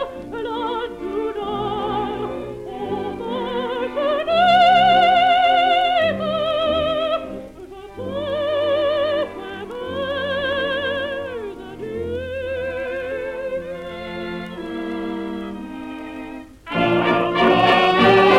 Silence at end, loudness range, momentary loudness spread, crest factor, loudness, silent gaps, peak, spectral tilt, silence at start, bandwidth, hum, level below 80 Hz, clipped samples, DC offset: 0 s; 11 LU; 17 LU; 18 dB; -20 LUFS; none; -2 dBFS; -5.5 dB/octave; 0 s; 12 kHz; none; -48 dBFS; under 0.1%; under 0.1%